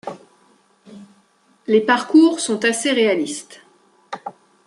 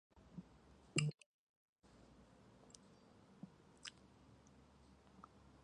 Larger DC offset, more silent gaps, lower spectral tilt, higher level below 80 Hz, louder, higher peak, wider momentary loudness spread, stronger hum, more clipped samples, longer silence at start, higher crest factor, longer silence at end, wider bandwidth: neither; second, none vs 1.26-1.76 s; about the same, -3.5 dB/octave vs -4 dB/octave; about the same, -72 dBFS vs -74 dBFS; first, -17 LUFS vs -48 LUFS; first, -2 dBFS vs -22 dBFS; second, 21 LU vs 25 LU; neither; neither; about the same, 0.05 s vs 0.15 s; second, 18 dB vs 32 dB; first, 0.35 s vs 0 s; about the same, 11.5 kHz vs 10.5 kHz